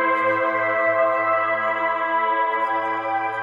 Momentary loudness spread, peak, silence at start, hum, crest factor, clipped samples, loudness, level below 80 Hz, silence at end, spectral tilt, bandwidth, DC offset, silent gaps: 4 LU; -8 dBFS; 0 s; none; 14 dB; under 0.1%; -21 LUFS; -82 dBFS; 0 s; -6 dB/octave; 7.4 kHz; under 0.1%; none